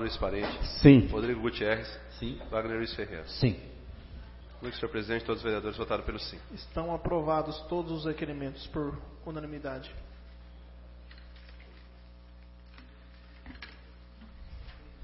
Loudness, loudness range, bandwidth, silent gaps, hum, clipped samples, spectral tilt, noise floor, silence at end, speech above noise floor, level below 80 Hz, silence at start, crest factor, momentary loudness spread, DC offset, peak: -30 LUFS; 24 LU; 5.8 kHz; none; 60 Hz at -50 dBFS; under 0.1%; -10 dB/octave; -52 dBFS; 0 s; 22 dB; -46 dBFS; 0 s; 26 dB; 22 LU; under 0.1%; -6 dBFS